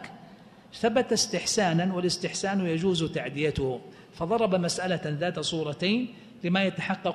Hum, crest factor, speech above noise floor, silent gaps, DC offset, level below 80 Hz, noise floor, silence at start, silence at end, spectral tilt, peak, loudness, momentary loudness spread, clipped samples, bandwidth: none; 16 dB; 24 dB; none; under 0.1%; -54 dBFS; -51 dBFS; 0 s; 0 s; -4.5 dB/octave; -12 dBFS; -27 LUFS; 8 LU; under 0.1%; 13 kHz